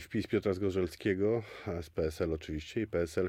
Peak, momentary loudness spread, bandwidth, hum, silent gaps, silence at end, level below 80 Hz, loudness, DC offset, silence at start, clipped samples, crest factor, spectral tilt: -18 dBFS; 7 LU; 16 kHz; none; none; 0 s; -52 dBFS; -34 LUFS; under 0.1%; 0 s; under 0.1%; 16 dB; -7 dB/octave